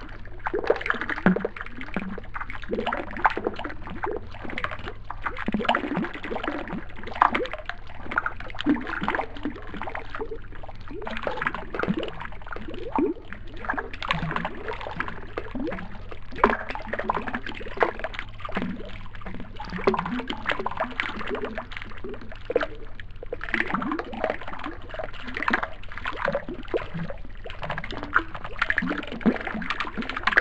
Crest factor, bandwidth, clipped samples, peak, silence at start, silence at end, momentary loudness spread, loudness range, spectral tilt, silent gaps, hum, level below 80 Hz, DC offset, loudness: 28 dB; 8.4 kHz; under 0.1%; 0 dBFS; 0 s; 0 s; 13 LU; 3 LU; -6.5 dB/octave; none; none; -40 dBFS; 1%; -29 LUFS